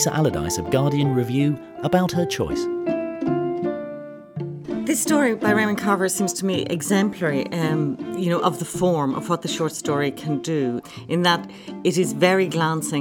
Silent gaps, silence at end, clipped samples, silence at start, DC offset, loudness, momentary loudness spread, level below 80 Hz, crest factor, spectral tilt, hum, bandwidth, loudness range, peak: none; 0 s; under 0.1%; 0 s; under 0.1%; -22 LUFS; 8 LU; -52 dBFS; 18 dB; -5 dB/octave; none; 19 kHz; 3 LU; -4 dBFS